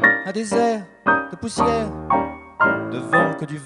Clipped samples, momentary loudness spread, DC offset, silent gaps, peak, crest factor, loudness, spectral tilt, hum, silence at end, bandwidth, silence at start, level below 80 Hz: under 0.1%; 6 LU; under 0.1%; none; -2 dBFS; 18 dB; -20 LUFS; -5 dB/octave; none; 0 s; 11.5 kHz; 0 s; -46 dBFS